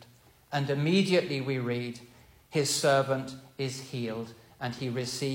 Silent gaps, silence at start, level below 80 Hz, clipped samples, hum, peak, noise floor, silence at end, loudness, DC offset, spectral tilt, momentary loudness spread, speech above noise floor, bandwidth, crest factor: none; 0 s; -68 dBFS; under 0.1%; none; -14 dBFS; -58 dBFS; 0 s; -30 LUFS; under 0.1%; -4.5 dB/octave; 14 LU; 29 dB; 16.5 kHz; 18 dB